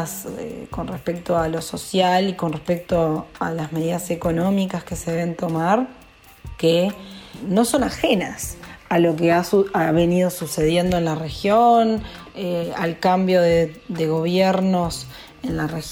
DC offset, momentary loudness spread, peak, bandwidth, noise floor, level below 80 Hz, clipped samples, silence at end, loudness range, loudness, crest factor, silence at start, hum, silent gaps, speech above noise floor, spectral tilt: under 0.1%; 13 LU; -4 dBFS; 17 kHz; -42 dBFS; -44 dBFS; under 0.1%; 0 s; 4 LU; -21 LUFS; 16 dB; 0 s; none; none; 21 dB; -5.5 dB/octave